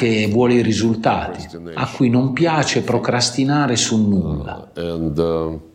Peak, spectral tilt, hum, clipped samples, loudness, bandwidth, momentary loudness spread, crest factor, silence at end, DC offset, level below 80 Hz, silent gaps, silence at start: -4 dBFS; -5 dB/octave; none; under 0.1%; -18 LUFS; 11 kHz; 11 LU; 14 dB; 0.1 s; under 0.1%; -42 dBFS; none; 0 s